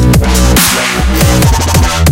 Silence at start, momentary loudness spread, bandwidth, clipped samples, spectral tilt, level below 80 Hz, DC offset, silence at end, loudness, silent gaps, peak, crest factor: 0 s; 3 LU; 17.5 kHz; 0.2%; -4 dB/octave; -12 dBFS; under 0.1%; 0 s; -8 LUFS; none; 0 dBFS; 8 dB